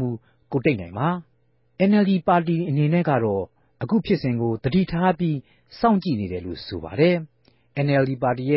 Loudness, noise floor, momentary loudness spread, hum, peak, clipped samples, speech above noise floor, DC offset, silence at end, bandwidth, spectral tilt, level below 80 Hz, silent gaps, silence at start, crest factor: -22 LUFS; -65 dBFS; 12 LU; none; -6 dBFS; under 0.1%; 44 dB; under 0.1%; 0 s; 5.8 kHz; -12 dB/octave; -50 dBFS; none; 0 s; 16 dB